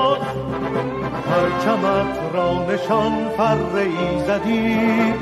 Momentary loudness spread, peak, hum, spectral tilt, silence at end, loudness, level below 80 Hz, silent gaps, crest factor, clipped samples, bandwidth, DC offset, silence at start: 5 LU; -4 dBFS; none; -6.5 dB/octave; 0 s; -20 LUFS; -44 dBFS; none; 14 dB; under 0.1%; 13.5 kHz; under 0.1%; 0 s